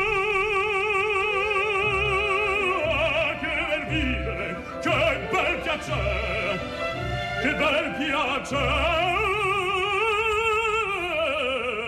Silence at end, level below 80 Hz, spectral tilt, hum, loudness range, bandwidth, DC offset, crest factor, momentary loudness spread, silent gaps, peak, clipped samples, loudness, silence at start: 0 s; -40 dBFS; -4.5 dB/octave; none; 3 LU; 14 kHz; under 0.1%; 14 dB; 5 LU; none; -12 dBFS; under 0.1%; -24 LUFS; 0 s